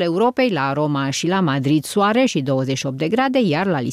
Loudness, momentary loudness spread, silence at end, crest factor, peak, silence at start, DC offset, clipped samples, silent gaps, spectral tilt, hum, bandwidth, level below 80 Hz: -19 LUFS; 3 LU; 0 s; 10 dB; -8 dBFS; 0 s; under 0.1%; under 0.1%; none; -5.5 dB/octave; none; 15 kHz; -60 dBFS